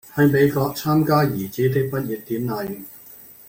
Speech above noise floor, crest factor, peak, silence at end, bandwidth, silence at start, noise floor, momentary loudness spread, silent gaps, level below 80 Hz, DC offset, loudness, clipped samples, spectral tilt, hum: 24 dB; 16 dB; -4 dBFS; 0.15 s; 17 kHz; 0.05 s; -44 dBFS; 18 LU; none; -54 dBFS; under 0.1%; -21 LUFS; under 0.1%; -7 dB/octave; none